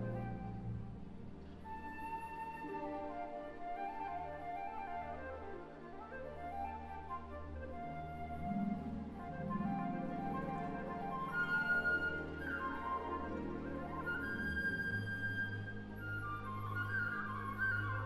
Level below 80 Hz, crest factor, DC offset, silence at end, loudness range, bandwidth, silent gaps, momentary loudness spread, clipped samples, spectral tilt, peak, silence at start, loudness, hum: -56 dBFS; 16 dB; under 0.1%; 0 s; 8 LU; 13.5 kHz; none; 11 LU; under 0.1%; -7.5 dB/octave; -26 dBFS; 0 s; -42 LUFS; none